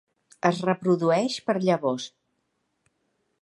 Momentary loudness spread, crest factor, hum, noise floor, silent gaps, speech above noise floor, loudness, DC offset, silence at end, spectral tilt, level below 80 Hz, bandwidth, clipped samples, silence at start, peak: 7 LU; 22 dB; none; -75 dBFS; none; 52 dB; -25 LUFS; under 0.1%; 1.35 s; -6 dB/octave; -76 dBFS; 11.5 kHz; under 0.1%; 0.45 s; -6 dBFS